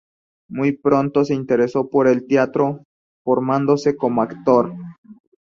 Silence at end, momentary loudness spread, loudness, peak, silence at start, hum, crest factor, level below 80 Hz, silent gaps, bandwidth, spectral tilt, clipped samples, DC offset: 0.35 s; 12 LU; -18 LUFS; -2 dBFS; 0.5 s; none; 16 dB; -60 dBFS; 2.85-3.25 s, 4.98-5.04 s; 7.4 kHz; -7.5 dB/octave; under 0.1%; under 0.1%